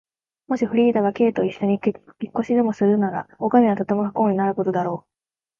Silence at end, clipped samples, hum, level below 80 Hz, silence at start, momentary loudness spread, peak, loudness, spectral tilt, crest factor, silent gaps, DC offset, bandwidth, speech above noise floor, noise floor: 0.6 s; under 0.1%; none; -64 dBFS; 0.5 s; 10 LU; -2 dBFS; -21 LUFS; -8.5 dB/octave; 18 dB; none; under 0.1%; 7 kHz; over 70 dB; under -90 dBFS